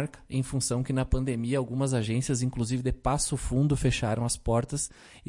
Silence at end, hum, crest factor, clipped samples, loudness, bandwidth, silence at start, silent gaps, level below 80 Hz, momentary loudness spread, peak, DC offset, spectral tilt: 0.1 s; none; 14 dB; under 0.1%; -29 LUFS; 11.5 kHz; 0 s; none; -40 dBFS; 5 LU; -14 dBFS; under 0.1%; -5.5 dB/octave